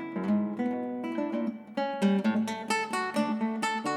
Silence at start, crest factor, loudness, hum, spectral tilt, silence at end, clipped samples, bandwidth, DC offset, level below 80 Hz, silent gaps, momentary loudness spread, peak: 0 s; 14 dB; -30 LUFS; none; -5.5 dB/octave; 0 s; under 0.1%; 13 kHz; under 0.1%; -80 dBFS; none; 7 LU; -14 dBFS